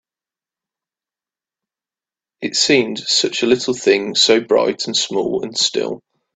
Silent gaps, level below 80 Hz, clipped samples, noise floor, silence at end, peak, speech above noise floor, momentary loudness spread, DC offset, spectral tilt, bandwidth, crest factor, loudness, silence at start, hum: none; -62 dBFS; under 0.1%; under -90 dBFS; 0.4 s; 0 dBFS; over 73 dB; 8 LU; under 0.1%; -2.5 dB/octave; 9.4 kHz; 20 dB; -16 LUFS; 2.4 s; none